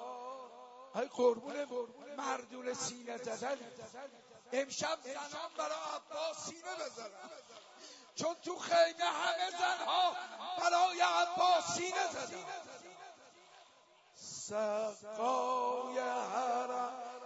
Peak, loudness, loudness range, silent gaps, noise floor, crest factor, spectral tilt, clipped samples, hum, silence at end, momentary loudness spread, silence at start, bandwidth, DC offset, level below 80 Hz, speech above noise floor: -18 dBFS; -36 LUFS; 9 LU; none; -65 dBFS; 20 dB; -1.5 dB/octave; under 0.1%; none; 0 s; 21 LU; 0 s; 8 kHz; under 0.1%; -86 dBFS; 29 dB